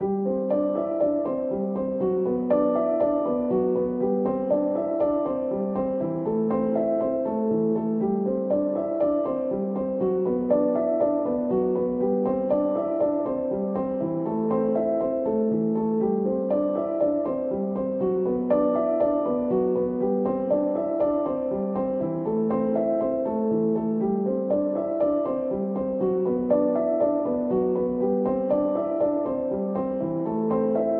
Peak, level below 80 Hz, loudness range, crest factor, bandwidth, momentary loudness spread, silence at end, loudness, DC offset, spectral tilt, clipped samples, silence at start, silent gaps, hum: -10 dBFS; -56 dBFS; 1 LU; 14 dB; 3.4 kHz; 4 LU; 0 s; -25 LUFS; under 0.1%; -12.5 dB/octave; under 0.1%; 0 s; none; none